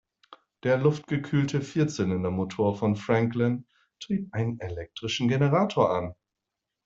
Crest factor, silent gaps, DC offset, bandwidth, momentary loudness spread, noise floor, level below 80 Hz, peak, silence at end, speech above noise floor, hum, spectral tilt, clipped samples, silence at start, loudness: 20 dB; none; under 0.1%; 7.8 kHz; 10 LU; -86 dBFS; -60 dBFS; -8 dBFS; 0.7 s; 60 dB; none; -7 dB/octave; under 0.1%; 0.3 s; -27 LUFS